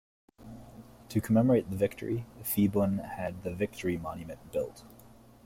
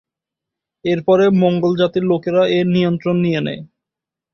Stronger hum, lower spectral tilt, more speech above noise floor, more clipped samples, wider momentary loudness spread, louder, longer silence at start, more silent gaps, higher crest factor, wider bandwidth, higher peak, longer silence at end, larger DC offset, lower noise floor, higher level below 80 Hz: neither; about the same, -7 dB/octave vs -8 dB/octave; second, 25 dB vs 70 dB; neither; first, 23 LU vs 8 LU; second, -31 LUFS vs -16 LUFS; second, 0.4 s vs 0.85 s; neither; about the same, 16 dB vs 14 dB; first, 16.5 kHz vs 6.6 kHz; second, -14 dBFS vs -2 dBFS; second, 0.4 s vs 0.7 s; neither; second, -55 dBFS vs -86 dBFS; about the same, -58 dBFS vs -56 dBFS